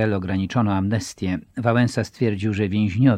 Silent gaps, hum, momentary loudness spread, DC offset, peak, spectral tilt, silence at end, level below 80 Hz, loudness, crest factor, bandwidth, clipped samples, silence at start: none; none; 6 LU; under 0.1%; -4 dBFS; -7 dB/octave; 0 s; -52 dBFS; -22 LUFS; 18 dB; 12 kHz; under 0.1%; 0 s